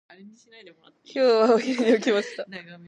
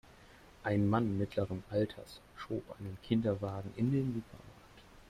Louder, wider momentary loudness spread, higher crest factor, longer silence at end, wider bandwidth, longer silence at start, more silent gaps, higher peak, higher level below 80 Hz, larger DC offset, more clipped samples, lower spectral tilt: first, -21 LUFS vs -36 LUFS; about the same, 16 LU vs 18 LU; about the same, 16 dB vs 20 dB; about the same, 0.1 s vs 0.1 s; second, 9.8 kHz vs 14 kHz; about the same, 0.25 s vs 0.2 s; neither; first, -8 dBFS vs -16 dBFS; second, -80 dBFS vs -62 dBFS; neither; neither; second, -4.5 dB/octave vs -8.5 dB/octave